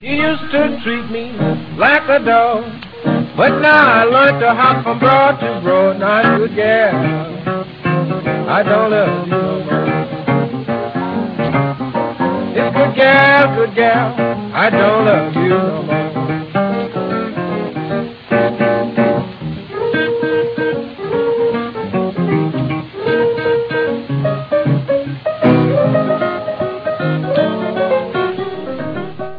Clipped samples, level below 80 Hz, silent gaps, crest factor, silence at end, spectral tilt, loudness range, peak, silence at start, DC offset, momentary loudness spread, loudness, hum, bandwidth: under 0.1%; -50 dBFS; none; 14 dB; 0 s; -9 dB/octave; 6 LU; 0 dBFS; 0 s; under 0.1%; 10 LU; -15 LUFS; none; 5.4 kHz